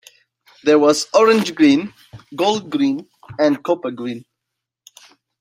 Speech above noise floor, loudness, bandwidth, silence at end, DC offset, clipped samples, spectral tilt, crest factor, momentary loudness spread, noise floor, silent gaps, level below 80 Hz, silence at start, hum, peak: 64 dB; -17 LUFS; 15.5 kHz; 1.2 s; under 0.1%; under 0.1%; -4.5 dB/octave; 16 dB; 17 LU; -81 dBFS; none; -64 dBFS; 0.65 s; none; -2 dBFS